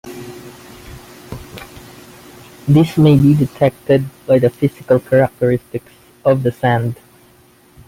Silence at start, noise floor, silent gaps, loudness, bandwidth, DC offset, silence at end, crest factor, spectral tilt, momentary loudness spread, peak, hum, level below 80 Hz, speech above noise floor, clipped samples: 0.05 s; -49 dBFS; none; -15 LUFS; 16 kHz; under 0.1%; 0.95 s; 16 dB; -8 dB/octave; 24 LU; -2 dBFS; none; -46 dBFS; 35 dB; under 0.1%